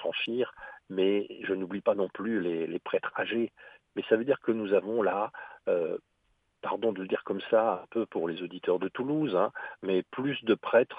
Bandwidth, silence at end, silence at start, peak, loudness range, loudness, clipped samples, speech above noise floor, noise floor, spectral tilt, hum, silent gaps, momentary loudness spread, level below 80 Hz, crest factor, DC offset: 4.9 kHz; 0 s; 0 s; -10 dBFS; 1 LU; -30 LUFS; under 0.1%; 44 dB; -73 dBFS; -8 dB/octave; none; none; 9 LU; -74 dBFS; 20 dB; under 0.1%